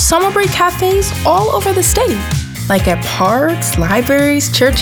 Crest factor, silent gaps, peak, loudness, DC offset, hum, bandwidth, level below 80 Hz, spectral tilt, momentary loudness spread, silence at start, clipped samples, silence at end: 12 dB; none; 0 dBFS; -13 LUFS; under 0.1%; none; over 20 kHz; -26 dBFS; -4 dB/octave; 4 LU; 0 s; under 0.1%; 0 s